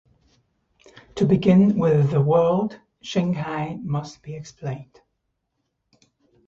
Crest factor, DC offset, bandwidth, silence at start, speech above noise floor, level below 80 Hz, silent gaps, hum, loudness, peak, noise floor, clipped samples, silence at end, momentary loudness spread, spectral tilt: 18 dB; under 0.1%; 7.6 kHz; 1.15 s; 55 dB; -56 dBFS; none; none; -21 LUFS; -4 dBFS; -76 dBFS; under 0.1%; 1.65 s; 20 LU; -8 dB/octave